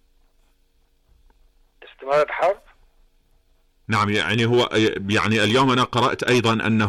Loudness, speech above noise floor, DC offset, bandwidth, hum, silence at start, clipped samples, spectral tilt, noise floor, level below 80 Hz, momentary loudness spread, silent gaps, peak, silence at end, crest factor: -20 LUFS; 42 dB; under 0.1%; 14 kHz; none; 2 s; under 0.1%; -5 dB/octave; -61 dBFS; -52 dBFS; 5 LU; none; -10 dBFS; 0 s; 12 dB